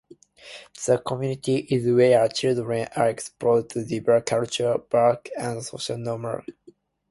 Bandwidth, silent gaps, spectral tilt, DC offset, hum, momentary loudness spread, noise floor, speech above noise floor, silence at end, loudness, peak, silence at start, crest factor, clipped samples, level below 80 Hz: 11.5 kHz; none; -5.5 dB/octave; under 0.1%; none; 12 LU; -55 dBFS; 32 dB; 0.6 s; -23 LUFS; -6 dBFS; 0.45 s; 18 dB; under 0.1%; -62 dBFS